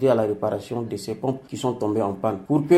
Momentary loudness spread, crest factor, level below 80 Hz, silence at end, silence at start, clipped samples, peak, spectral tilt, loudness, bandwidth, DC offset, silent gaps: 7 LU; 18 dB; -60 dBFS; 0 s; 0 s; under 0.1%; -4 dBFS; -7 dB/octave; -25 LUFS; 15 kHz; under 0.1%; none